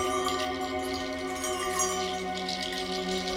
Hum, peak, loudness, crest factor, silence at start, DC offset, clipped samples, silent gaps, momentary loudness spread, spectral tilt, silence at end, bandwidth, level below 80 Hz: none; -16 dBFS; -30 LUFS; 16 dB; 0 s; under 0.1%; under 0.1%; none; 4 LU; -2.5 dB/octave; 0 s; 18 kHz; -54 dBFS